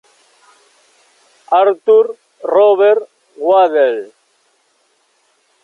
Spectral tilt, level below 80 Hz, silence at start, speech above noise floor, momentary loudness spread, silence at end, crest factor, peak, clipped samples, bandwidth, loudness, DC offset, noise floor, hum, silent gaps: -4.5 dB/octave; -72 dBFS; 1.5 s; 48 dB; 12 LU; 1.6 s; 14 dB; -2 dBFS; under 0.1%; 6.6 kHz; -13 LUFS; under 0.1%; -59 dBFS; none; none